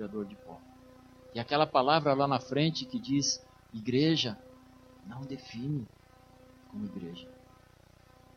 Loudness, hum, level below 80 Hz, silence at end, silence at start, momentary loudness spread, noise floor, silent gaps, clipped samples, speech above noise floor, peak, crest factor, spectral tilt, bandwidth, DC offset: -31 LUFS; 60 Hz at -55 dBFS; -66 dBFS; 1 s; 0 s; 21 LU; -59 dBFS; none; under 0.1%; 28 dB; -10 dBFS; 24 dB; -4.5 dB/octave; 7.4 kHz; under 0.1%